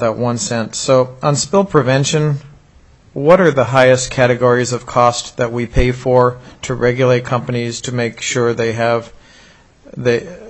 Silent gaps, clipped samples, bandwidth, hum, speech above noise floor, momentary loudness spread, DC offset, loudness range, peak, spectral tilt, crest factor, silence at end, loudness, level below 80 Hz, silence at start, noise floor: none; under 0.1%; 8.4 kHz; none; 32 dB; 9 LU; under 0.1%; 4 LU; 0 dBFS; -5 dB/octave; 16 dB; 0 s; -15 LUFS; -34 dBFS; 0 s; -46 dBFS